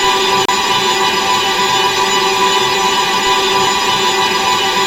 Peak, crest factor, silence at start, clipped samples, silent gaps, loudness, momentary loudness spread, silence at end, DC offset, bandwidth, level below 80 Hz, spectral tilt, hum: 0 dBFS; 14 dB; 0 s; under 0.1%; none; -12 LUFS; 1 LU; 0 s; under 0.1%; 16 kHz; -46 dBFS; -1.5 dB/octave; none